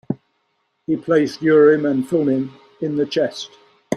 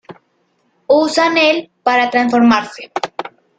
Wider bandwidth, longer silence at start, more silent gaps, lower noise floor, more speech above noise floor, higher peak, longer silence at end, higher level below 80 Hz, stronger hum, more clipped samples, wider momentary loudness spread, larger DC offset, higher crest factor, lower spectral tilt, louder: first, 11.5 kHz vs 9.2 kHz; about the same, 0.1 s vs 0.1 s; neither; first, -69 dBFS vs -62 dBFS; first, 52 dB vs 48 dB; about the same, -2 dBFS vs 0 dBFS; second, 0 s vs 0.3 s; second, -64 dBFS vs -58 dBFS; neither; neither; first, 18 LU vs 13 LU; neither; about the same, 16 dB vs 14 dB; first, -6.5 dB/octave vs -4 dB/octave; second, -18 LUFS vs -14 LUFS